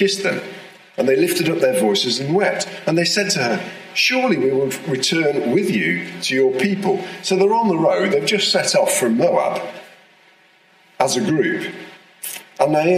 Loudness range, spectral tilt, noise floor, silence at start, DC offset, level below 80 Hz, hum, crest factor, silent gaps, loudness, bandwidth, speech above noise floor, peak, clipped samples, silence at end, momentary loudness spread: 4 LU; -4 dB/octave; -53 dBFS; 0 s; under 0.1%; -68 dBFS; none; 18 dB; none; -18 LUFS; 15.5 kHz; 35 dB; 0 dBFS; under 0.1%; 0 s; 11 LU